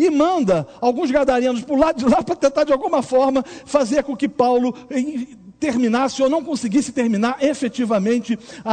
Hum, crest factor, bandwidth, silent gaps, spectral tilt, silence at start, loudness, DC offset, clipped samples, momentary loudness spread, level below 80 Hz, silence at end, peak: none; 16 dB; 9.4 kHz; none; -5.5 dB/octave; 0 s; -19 LUFS; under 0.1%; under 0.1%; 7 LU; -50 dBFS; 0 s; -2 dBFS